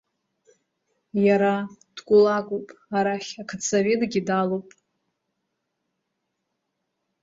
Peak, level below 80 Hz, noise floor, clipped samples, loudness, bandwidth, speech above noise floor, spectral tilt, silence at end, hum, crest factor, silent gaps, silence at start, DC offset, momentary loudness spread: -8 dBFS; -68 dBFS; -79 dBFS; under 0.1%; -23 LUFS; 7.8 kHz; 57 dB; -5 dB/octave; 2.6 s; none; 18 dB; none; 1.15 s; under 0.1%; 14 LU